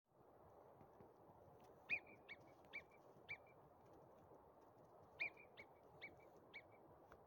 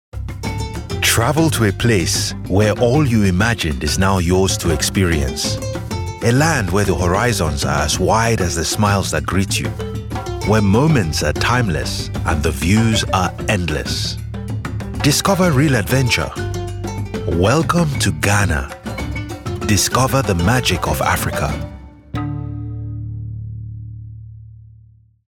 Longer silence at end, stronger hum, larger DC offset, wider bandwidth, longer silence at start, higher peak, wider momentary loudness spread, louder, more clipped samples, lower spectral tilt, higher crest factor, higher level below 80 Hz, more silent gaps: second, 0 s vs 0.75 s; neither; neither; about the same, 17 kHz vs 17.5 kHz; about the same, 0.1 s vs 0.15 s; second, -34 dBFS vs -2 dBFS; first, 20 LU vs 12 LU; second, -54 LUFS vs -17 LUFS; neither; about the same, -4.5 dB/octave vs -4.5 dB/octave; first, 26 dB vs 16 dB; second, -86 dBFS vs -32 dBFS; neither